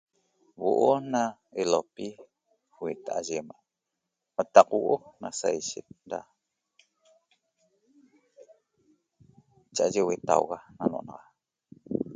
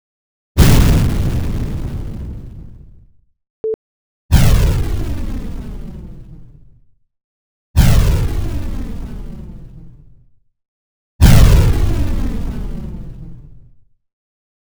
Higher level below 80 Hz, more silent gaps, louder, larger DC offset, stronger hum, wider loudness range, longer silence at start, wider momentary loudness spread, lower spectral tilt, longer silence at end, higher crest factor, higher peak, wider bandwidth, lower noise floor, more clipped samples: second, -72 dBFS vs -18 dBFS; second, none vs 3.50-3.64 s, 3.74-4.29 s, 7.24-7.74 s, 10.68-11.19 s; second, -28 LUFS vs -16 LUFS; neither; neither; first, 10 LU vs 7 LU; about the same, 0.6 s vs 0.55 s; second, 17 LU vs 23 LU; second, -4.5 dB/octave vs -6 dB/octave; second, 0 s vs 0.85 s; first, 28 dB vs 16 dB; about the same, -2 dBFS vs 0 dBFS; second, 9.6 kHz vs over 20 kHz; first, -85 dBFS vs -48 dBFS; neither